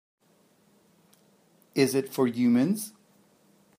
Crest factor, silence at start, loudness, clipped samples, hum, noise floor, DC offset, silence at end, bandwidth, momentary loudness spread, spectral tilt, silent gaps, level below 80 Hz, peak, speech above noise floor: 22 dB; 1.75 s; -26 LUFS; under 0.1%; none; -64 dBFS; under 0.1%; 0.9 s; 15.5 kHz; 10 LU; -5.5 dB/octave; none; -76 dBFS; -8 dBFS; 40 dB